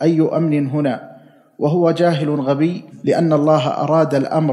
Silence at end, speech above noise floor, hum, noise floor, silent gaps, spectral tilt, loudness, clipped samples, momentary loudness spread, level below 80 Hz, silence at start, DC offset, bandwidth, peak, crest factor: 0 s; 28 dB; none; -44 dBFS; none; -8 dB/octave; -17 LUFS; under 0.1%; 6 LU; -72 dBFS; 0 s; under 0.1%; 11 kHz; -2 dBFS; 16 dB